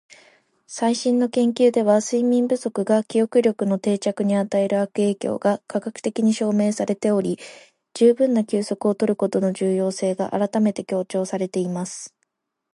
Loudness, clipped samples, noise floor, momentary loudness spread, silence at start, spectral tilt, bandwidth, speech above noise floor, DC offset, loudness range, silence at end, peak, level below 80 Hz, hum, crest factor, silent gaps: -21 LUFS; under 0.1%; -74 dBFS; 8 LU; 0.7 s; -6 dB/octave; 11.5 kHz; 54 dB; under 0.1%; 3 LU; 0.65 s; -4 dBFS; -70 dBFS; none; 16 dB; none